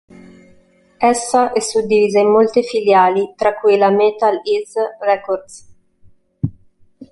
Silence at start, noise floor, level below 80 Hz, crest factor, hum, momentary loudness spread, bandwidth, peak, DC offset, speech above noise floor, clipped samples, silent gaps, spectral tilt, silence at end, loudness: 1 s; -51 dBFS; -52 dBFS; 14 dB; none; 12 LU; 11.5 kHz; -2 dBFS; under 0.1%; 36 dB; under 0.1%; none; -4.5 dB/octave; 0.05 s; -15 LUFS